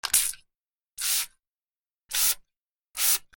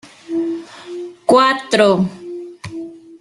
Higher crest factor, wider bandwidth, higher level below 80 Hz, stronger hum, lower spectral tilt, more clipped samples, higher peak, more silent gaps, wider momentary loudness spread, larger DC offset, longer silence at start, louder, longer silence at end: first, 26 dB vs 16 dB; first, 19 kHz vs 12 kHz; about the same, -62 dBFS vs -58 dBFS; neither; second, 3.5 dB/octave vs -5 dB/octave; neither; about the same, -4 dBFS vs -2 dBFS; first, 0.68-0.74 s, 0.82-0.90 s, 1.48-1.84 s, 2.00-2.08 s, 2.62-2.85 s vs none; second, 14 LU vs 19 LU; neither; about the same, 0.05 s vs 0.05 s; second, -25 LUFS vs -16 LUFS; about the same, 0.15 s vs 0.05 s